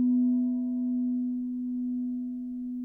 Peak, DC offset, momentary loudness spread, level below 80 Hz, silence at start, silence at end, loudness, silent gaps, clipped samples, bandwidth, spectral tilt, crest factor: -20 dBFS; under 0.1%; 9 LU; -66 dBFS; 0 s; 0 s; -30 LUFS; none; under 0.1%; 1 kHz; -11 dB/octave; 8 dB